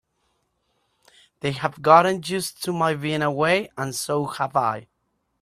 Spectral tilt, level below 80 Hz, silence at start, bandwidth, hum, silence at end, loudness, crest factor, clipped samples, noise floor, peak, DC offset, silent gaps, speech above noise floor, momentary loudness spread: -4.5 dB/octave; -62 dBFS; 1.45 s; 15 kHz; none; 0.6 s; -22 LUFS; 22 dB; under 0.1%; -73 dBFS; -2 dBFS; under 0.1%; none; 51 dB; 12 LU